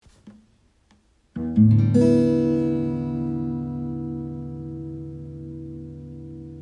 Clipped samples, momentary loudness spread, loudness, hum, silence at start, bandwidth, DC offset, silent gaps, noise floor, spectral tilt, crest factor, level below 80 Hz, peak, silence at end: under 0.1%; 21 LU; -22 LUFS; none; 0.25 s; 10 kHz; under 0.1%; none; -60 dBFS; -10 dB/octave; 18 dB; -50 dBFS; -6 dBFS; 0 s